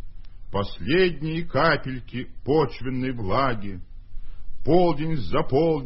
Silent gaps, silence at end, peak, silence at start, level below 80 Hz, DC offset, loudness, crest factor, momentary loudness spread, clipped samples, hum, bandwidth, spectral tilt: none; 0 s; -6 dBFS; 0 s; -40 dBFS; under 0.1%; -24 LUFS; 18 dB; 12 LU; under 0.1%; none; 5.8 kHz; -11 dB/octave